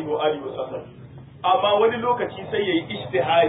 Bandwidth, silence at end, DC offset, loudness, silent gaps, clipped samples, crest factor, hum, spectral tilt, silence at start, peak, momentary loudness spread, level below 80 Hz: 4 kHz; 0 s; under 0.1%; -23 LUFS; none; under 0.1%; 16 dB; none; -10 dB/octave; 0 s; -6 dBFS; 17 LU; -56 dBFS